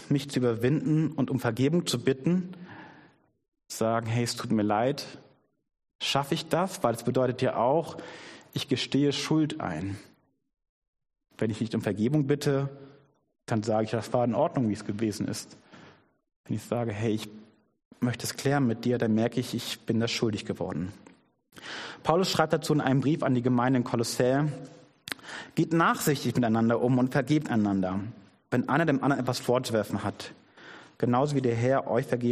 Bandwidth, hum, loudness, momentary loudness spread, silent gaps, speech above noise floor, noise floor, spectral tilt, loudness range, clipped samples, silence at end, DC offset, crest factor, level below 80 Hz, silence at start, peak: 13.5 kHz; none; -28 LUFS; 13 LU; 3.48-3.52 s, 5.95-5.99 s, 10.69-10.82 s, 10.88-10.93 s, 16.36-16.44 s, 17.85-17.91 s; 33 dB; -60 dBFS; -6 dB/octave; 5 LU; under 0.1%; 0 s; under 0.1%; 22 dB; -64 dBFS; 0 s; -8 dBFS